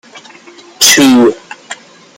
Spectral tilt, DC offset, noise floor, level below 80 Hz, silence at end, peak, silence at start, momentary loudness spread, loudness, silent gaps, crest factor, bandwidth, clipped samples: -1.5 dB/octave; under 0.1%; -37 dBFS; -54 dBFS; 0.45 s; 0 dBFS; 0.15 s; 23 LU; -7 LUFS; none; 12 dB; over 20 kHz; 0.2%